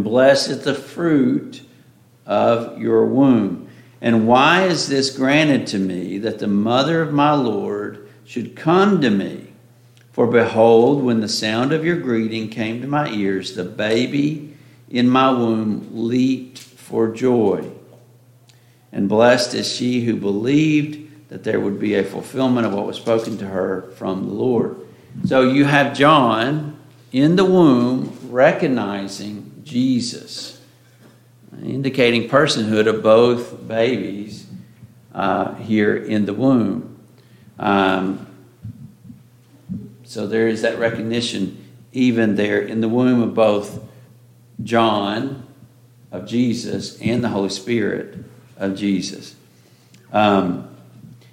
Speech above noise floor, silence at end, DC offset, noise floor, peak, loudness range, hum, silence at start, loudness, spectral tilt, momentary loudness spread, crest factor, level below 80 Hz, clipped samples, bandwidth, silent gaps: 33 dB; 0.25 s; under 0.1%; -51 dBFS; -2 dBFS; 6 LU; none; 0 s; -18 LUFS; -5.5 dB/octave; 17 LU; 18 dB; -62 dBFS; under 0.1%; 14.5 kHz; none